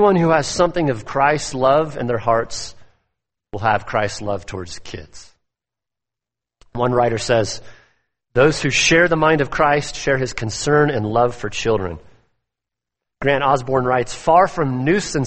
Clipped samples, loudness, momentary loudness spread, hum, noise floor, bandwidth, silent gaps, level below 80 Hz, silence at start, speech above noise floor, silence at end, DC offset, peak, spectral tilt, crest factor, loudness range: under 0.1%; -18 LUFS; 15 LU; none; -87 dBFS; 8.8 kHz; none; -42 dBFS; 0 s; 69 dB; 0 s; under 0.1%; -2 dBFS; -4.5 dB/octave; 18 dB; 9 LU